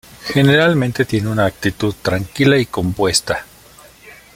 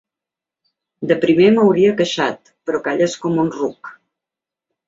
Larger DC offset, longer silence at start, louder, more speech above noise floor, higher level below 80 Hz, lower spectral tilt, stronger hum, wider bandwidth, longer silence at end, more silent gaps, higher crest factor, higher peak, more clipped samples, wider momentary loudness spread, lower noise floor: neither; second, 0.2 s vs 1 s; about the same, -16 LUFS vs -16 LUFS; second, 28 dB vs 71 dB; first, -44 dBFS vs -60 dBFS; about the same, -5 dB/octave vs -6 dB/octave; neither; first, 16.5 kHz vs 7.8 kHz; second, 0.2 s vs 0.95 s; neither; about the same, 16 dB vs 16 dB; about the same, -2 dBFS vs -2 dBFS; neither; second, 8 LU vs 16 LU; second, -44 dBFS vs -87 dBFS